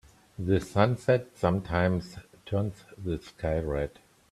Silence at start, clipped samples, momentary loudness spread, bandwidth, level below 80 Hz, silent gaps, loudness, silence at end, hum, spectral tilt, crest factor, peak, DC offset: 0.4 s; under 0.1%; 12 LU; 13 kHz; -48 dBFS; none; -29 LUFS; 0.4 s; none; -7.5 dB/octave; 22 dB; -8 dBFS; under 0.1%